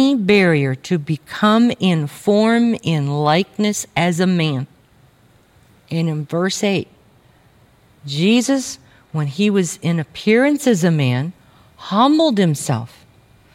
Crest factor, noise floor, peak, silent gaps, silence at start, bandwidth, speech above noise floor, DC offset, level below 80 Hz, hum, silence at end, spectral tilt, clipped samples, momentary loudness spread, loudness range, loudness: 16 dB; -52 dBFS; -2 dBFS; none; 0 s; 16 kHz; 36 dB; under 0.1%; -60 dBFS; none; 0.7 s; -5.5 dB/octave; under 0.1%; 13 LU; 6 LU; -17 LUFS